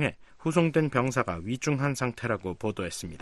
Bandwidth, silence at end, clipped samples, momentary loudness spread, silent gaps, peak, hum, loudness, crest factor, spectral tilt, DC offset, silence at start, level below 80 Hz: 12.5 kHz; 0 s; under 0.1%; 8 LU; none; -8 dBFS; none; -29 LUFS; 20 dB; -6 dB/octave; under 0.1%; 0 s; -56 dBFS